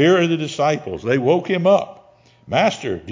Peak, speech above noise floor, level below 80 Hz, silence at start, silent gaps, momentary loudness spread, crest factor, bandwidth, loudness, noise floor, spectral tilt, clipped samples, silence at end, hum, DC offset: -2 dBFS; 32 dB; -52 dBFS; 0 s; none; 7 LU; 16 dB; 7.6 kHz; -18 LUFS; -50 dBFS; -6 dB/octave; under 0.1%; 0 s; none; under 0.1%